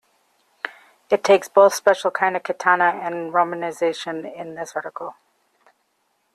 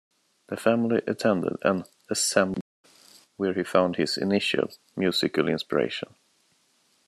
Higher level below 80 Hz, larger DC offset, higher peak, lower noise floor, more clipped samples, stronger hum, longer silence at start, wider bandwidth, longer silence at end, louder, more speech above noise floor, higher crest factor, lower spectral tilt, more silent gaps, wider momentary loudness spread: second, -74 dBFS vs -68 dBFS; neither; about the same, -2 dBFS vs -4 dBFS; about the same, -69 dBFS vs -67 dBFS; neither; neither; first, 0.65 s vs 0.5 s; about the same, 13.5 kHz vs 13.5 kHz; first, 1.25 s vs 1.05 s; first, -20 LUFS vs -26 LUFS; first, 49 dB vs 41 dB; about the same, 20 dB vs 22 dB; about the same, -3.5 dB/octave vs -4 dB/octave; second, none vs 2.61-2.84 s; first, 18 LU vs 8 LU